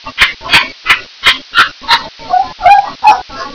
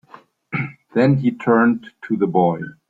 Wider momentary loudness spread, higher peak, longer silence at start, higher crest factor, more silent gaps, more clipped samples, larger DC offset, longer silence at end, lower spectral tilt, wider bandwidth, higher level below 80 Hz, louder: second, 6 LU vs 10 LU; about the same, 0 dBFS vs -2 dBFS; second, 0.05 s vs 0.5 s; second, 10 dB vs 18 dB; neither; first, 2% vs under 0.1%; first, 0.4% vs under 0.1%; second, 0 s vs 0.15 s; second, -1.5 dB/octave vs -9.5 dB/octave; second, 5.4 kHz vs 7.4 kHz; first, -38 dBFS vs -58 dBFS; first, -9 LUFS vs -19 LUFS